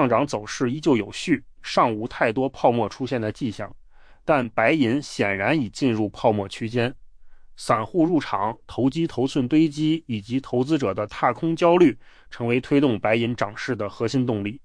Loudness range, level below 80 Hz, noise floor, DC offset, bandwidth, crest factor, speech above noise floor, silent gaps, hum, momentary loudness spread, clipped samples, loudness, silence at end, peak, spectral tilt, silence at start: 3 LU; -52 dBFS; -43 dBFS; under 0.1%; 10.5 kHz; 18 dB; 21 dB; none; none; 8 LU; under 0.1%; -23 LUFS; 0.1 s; -6 dBFS; -6.5 dB/octave; 0 s